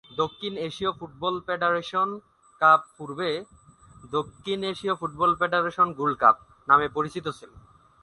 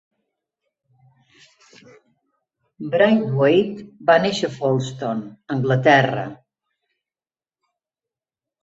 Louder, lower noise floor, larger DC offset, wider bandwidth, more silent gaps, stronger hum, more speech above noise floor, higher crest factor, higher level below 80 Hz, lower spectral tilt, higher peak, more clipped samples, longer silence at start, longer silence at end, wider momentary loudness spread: second, -25 LUFS vs -19 LUFS; second, -51 dBFS vs under -90 dBFS; neither; first, 11.5 kHz vs 8 kHz; neither; neither; second, 26 dB vs over 71 dB; about the same, 22 dB vs 20 dB; about the same, -60 dBFS vs -64 dBFS; about the same, -5.5 dB/octave vs -6.5 dB/octave; about the same, -4 dBFS vs -2 dBFS; neither; second, 0.1 s vs 2.8 s; second, 0.45 s vs 2.3 s; about the same, 11 LU vs 13 LU